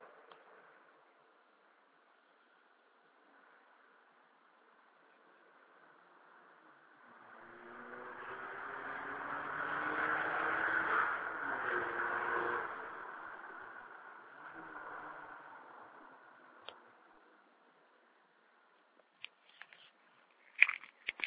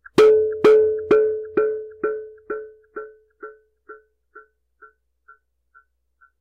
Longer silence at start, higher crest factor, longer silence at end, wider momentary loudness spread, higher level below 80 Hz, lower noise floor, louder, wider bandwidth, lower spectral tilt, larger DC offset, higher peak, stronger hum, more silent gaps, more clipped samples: second, 0 s vs 0.15 s; first, 36 dB vs 16 dB; second, 0 s vs 2 s; about the same, 25 LU vs 27 LU; second, -80 dBFS vs -58 dBFS; first, -70 dBFS vs -61 dBFS; second, -38 LUFS vs -18 LUFS; second, 4 kHz vs 9.4 kHz; second, -0.5 dB/octave vs -5.5 dB/octave; neither; about the same, -6 dBFS vs -6 dBFS; neither; neither; neither